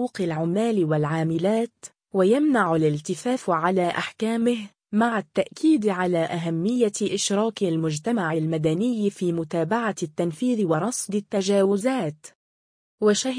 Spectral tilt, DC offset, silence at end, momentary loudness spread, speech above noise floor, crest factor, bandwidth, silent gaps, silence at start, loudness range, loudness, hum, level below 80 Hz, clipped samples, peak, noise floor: -5.5 dB/octave; under 0.1%; 0 s; 6 LU; over 67 dB; 16 dB; 10.5 kHz; 12.35-12.98 s; 0 s; 2 LU; -24 LUFS; none; -66 dBFS; under 0.1%; -8 dBFS; under -90 dBFS